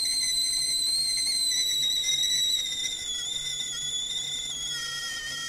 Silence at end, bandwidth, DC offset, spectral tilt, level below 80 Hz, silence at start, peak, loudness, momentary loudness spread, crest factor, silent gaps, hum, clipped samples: 0 s; 16 kHz; under 0.1%; 2 dB/octave; -56 dBFS; 0 s; -14 dBFS; -25 LUFS; 7 LU; 14 dB; none; none; under 0.1%